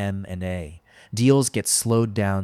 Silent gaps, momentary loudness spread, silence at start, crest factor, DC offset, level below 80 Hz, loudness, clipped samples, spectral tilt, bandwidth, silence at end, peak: none; 15 LU; 0 s; 18 dB; under 0.1%; -50 dBFS; -21 LUFS; under 0.1%; -5 dB/octave; 15.5 kHz; 0 s; -4 dBFS